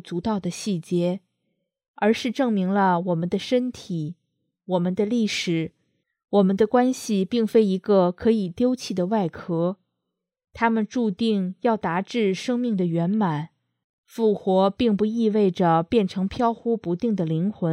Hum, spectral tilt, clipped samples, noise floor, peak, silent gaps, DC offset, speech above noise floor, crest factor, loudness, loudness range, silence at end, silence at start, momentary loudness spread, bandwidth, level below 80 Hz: none; -6.5 dB/octave; under 0.1%; -82 dBFS; -6 dBFS; 1.88-1.94 s, 13.84-14.04 s; under 0.1%; 60 dB; 16 dB; -23 LUFS; 3 LU; 0 s; 0.05 s; 7 LU; 14 kHz; -58 dBFS